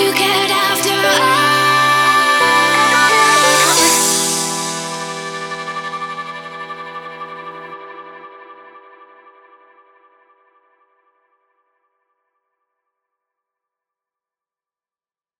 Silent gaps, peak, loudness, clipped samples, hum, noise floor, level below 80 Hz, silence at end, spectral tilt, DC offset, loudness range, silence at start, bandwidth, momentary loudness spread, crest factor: none; 0 dBFS; -13 LUFS; under 0.1%; none; under -90 dBFS; -62 dBFS; 6.6 s; -1 dB/octave; under 0.1%; 22 LU; 0 s; 17.5 kHz; 20 LU; 18 dB